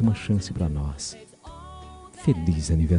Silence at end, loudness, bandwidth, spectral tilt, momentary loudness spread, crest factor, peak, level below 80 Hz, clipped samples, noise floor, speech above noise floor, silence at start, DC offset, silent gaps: 0 s; -26 LUFS; 10.5 kHz; -6.5 dB/octave; 20 LU; 16 dB; -10 dBFS; -36 dBFS; under 0.1%; -43 dBFS; 20 dB; 0 s; under 0.1%; none